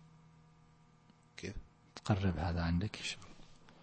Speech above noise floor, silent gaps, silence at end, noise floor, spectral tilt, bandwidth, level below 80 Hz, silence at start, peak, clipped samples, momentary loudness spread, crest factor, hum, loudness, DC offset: 30 dB; none; 0.1 s; -65 dBFS; -6 dB/octave; 8.4 kHz; -52 dBFS; 0 s; -16 dBFS; under 0.1%; 21 LU; 24 dB; none; -38 LUFS; under 0.1%